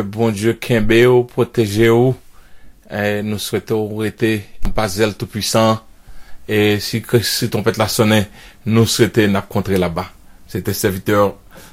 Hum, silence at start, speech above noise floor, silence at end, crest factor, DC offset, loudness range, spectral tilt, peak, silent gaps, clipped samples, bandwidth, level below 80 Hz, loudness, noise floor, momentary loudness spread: none; 0 s; 22 dB; 0.05 s; 16 dB; under 0.1%; 3 LU; -5 dB/octave; 0 dBFS; none; under 0.1%; 16 kHz; -34 dBFS; -16 LUFS; -38 dBFS; 10 LU